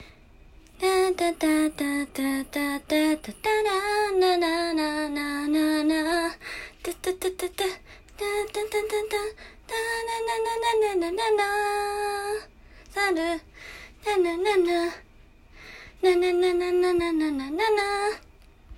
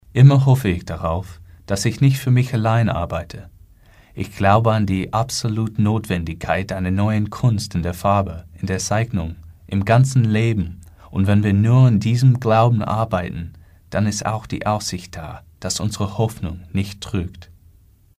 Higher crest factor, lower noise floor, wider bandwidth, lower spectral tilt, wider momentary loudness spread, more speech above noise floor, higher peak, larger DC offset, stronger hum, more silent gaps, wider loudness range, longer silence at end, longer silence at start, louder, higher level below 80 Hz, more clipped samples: about the same, 16 dB vs 18 dB; about the same, -52 dBFS vs -51 dBFS; first, 16 kHz vs 14.5 kHz; second, -3 dB/octave vs -6.5 dB/octave; second, 12 LU vs 15 LU; second, 27 dB vs 33 dB; second, -10 dBFS vs 0 dBFS; neither; neither; neither; second, 4 LU vs 7 LU; second, 0 s vs 0.75 s; second, 0 s vs 0.15 s; second, -26 LUFS vs -19 LUFS; second, -52 dBFS vs -42 dBFS; neither